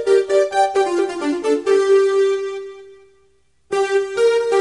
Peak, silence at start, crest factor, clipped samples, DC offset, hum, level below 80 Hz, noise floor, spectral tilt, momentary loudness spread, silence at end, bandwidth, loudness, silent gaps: -4 dBFS; 0 s; 14 dB; under 0.1%; 0.1%; none; -62 dBFS; -60 dBFS; -3 dB/octave; 10 LU; 0 s; 11 kHz; -17 LUFS; none